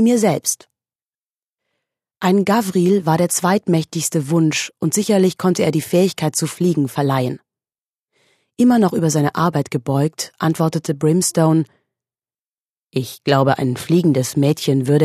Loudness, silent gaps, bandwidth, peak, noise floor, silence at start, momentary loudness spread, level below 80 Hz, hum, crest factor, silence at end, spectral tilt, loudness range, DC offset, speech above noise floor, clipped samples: -17 LUFS; 1.03-1.56 s, 7.89-8.08 s, 12.42-12.87 s; 14 kHz; 0 dBFS; under -90 dBFS; 0 s; 6 LU; -60 dBFS; none; 16 dB; 0 s; -5.5 dB/octave; 3 LU; under 0.1%; over 74 dB; under 0.1%